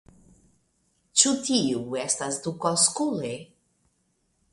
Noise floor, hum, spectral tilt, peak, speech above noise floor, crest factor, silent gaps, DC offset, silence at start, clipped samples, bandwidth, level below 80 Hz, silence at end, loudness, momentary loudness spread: -72 dBFS; none; -2.5 dB/octave; -2 dBFS; 46 dB; 26 dB; none; under 0.1%; 1.15 s; under 0.1%; 11.5 kHz; -66 dBFS; 1.1 s; -24 LUFS; 11 LU